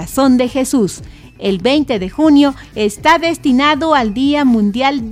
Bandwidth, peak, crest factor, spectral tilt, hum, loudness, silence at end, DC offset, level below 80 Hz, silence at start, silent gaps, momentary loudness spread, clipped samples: 16 kHz; 0 dBFS; 14 dB; -4.5 dB/octave; none; -13 LUFS; 0 s; under 0.1%; -40 dBFS; 0 s; none; 8 LU; under 0.1%